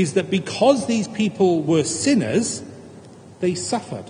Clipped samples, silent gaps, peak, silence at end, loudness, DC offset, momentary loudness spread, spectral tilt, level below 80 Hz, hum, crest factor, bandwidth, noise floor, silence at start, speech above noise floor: under 0.1%; none; -2 dBFS; 0 s; -20 LUFS; under 0.1%; 8 LU; -5 dB/octave; -62 dBFS; none; 18 dB; 10 kHz; -43 dBFS; 0 s; 23 dB